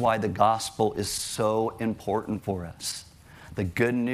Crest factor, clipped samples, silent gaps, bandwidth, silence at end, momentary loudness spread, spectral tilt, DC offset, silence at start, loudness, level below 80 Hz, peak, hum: 20 dB; under 0.1%; none; 15.5 kHz; 0 s; 10 LU; -4.5 dB/octave; under 0.1%; 0 s; -27 LUFS; -56 dBFS; -6 dBFS; none